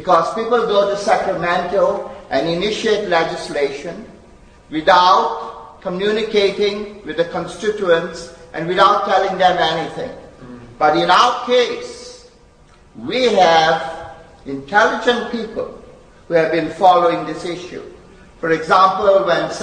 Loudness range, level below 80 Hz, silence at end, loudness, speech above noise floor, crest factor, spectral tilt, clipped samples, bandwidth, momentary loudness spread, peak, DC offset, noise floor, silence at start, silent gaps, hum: 3 LU; -48 dBFS; 0 s; -16 LUFS; 31 dB; 18 dB; -4 dB/octave; under 0.1%; 10 kHz; 18 LU; 0 dBFS; under 0.1%; -47 dBFS; 0 s; none; none